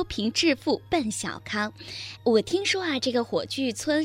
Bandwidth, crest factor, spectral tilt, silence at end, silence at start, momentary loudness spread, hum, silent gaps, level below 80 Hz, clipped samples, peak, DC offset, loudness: 16 kHz; 18 dB; -3.5 dB/octave; 0 s; 0 s; 8 LU; none; none; -54 dBFS; under 0.1%; -8 dBFS; under 0.1%; -26 LUFS